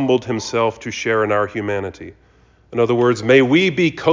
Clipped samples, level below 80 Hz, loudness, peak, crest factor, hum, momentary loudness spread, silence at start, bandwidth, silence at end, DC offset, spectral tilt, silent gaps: under 0.1%; -52 dBFS; -17 LUFS; -2 dBFS; 16 dB; none; 12 LU; 0 s; 7.6 kHz; 0 s; under 0.1%; -5.5 dB/octave; none